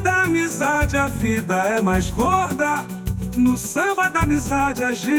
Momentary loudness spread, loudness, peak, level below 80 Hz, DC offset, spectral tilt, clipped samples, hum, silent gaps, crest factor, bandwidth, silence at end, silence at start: 4 LU; -20 LUFS; -6 dBFS; -34 dBFS; under 0.1%; -5 dB/octave; under 0.1%; none; none; 14 dB; 19.5 kHz; 0 s; 0 s